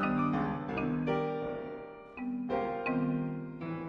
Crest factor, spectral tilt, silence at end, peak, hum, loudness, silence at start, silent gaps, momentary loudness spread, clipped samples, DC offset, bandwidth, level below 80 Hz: 14 dB; -9 dB/octave; 0 s; -18 dBFS; none; -34 LUFS; 0 s; none; 10 LU; under 0.1%; under 0.1%; 5.8 kHz; -58 dBFS